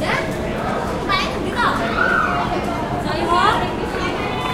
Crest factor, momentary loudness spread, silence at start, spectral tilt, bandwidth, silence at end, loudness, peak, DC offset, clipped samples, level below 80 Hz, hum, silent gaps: 16 dB; 6 LU; 0 s; -5 dB/octave; 16 kHz; 0 s; -19 LUFS; -4 dBFS; under 0.1%; under 0.1%; -34 dBFS; none; none